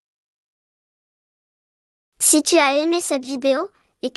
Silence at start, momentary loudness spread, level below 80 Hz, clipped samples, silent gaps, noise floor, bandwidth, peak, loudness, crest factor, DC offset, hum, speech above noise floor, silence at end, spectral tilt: 2.2 s; 11 LU; -72 dBFS; under 0.1%; none; under -90 dBFS; 12.5 kHz; -2 dBFS; -18 LUFS; 20 dB; under 0.1%; none; over 72 dB; 0.05 s; 0 dB/octave